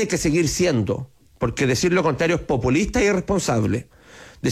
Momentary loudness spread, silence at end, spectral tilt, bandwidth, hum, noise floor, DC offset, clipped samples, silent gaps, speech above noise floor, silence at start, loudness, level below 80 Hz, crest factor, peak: 9 LU; 0 s; -5 dB/octave; 15 kHz; none; -44 dBFS; under 0.1%; under 0.1%; none; 24 dB; 0 s; -21 LUFS; -40 dBFS; 12 dB; -8 dBFS